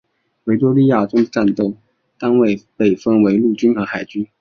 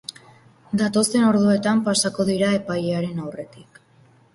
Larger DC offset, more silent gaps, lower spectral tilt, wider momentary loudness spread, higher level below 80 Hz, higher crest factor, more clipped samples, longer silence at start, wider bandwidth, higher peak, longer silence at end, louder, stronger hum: neither; neither; first, -8 dB/octave vs -4.5 dB/octave; second, 10 LU vs 16 LU; about the same, -58 dBFS vs -60 dBFS; about the same, 14 dB vs 16 dB; neither; second, 0.45 s vs 0.7 s; second, 6.8 kHz vs 12 kHz; first, -2 dBFS vs -6 dBFS; second, 0.15 s vs 0.7 s; first, -16 LUFS vs -20 LUFS; neither